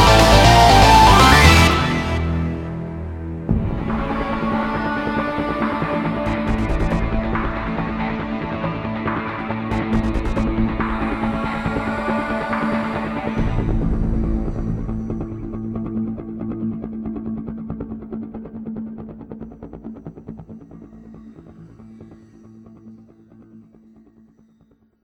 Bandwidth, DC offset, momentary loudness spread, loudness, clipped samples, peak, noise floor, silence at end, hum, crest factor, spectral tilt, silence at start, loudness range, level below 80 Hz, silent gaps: 16.5 kHz; under 0.1%; 21 LU; -19 LUFS; under 0.1%; 0 dBFS; -57 dBFS; 1.45 s; none; 20 dB; -5 dB/octave; 0 s; 19 LU; -26 dBFS; none